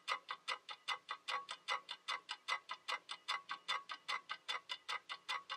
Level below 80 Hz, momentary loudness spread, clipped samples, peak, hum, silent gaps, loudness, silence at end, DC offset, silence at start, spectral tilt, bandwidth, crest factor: under -90 dBFS; 2 LU; under 0.1%; -24 dBFS; none; none; -44 LUFS; 0 s; under 0.1%; 0.05 s; 1.5 dB/octave; 13 kHz; 22 dB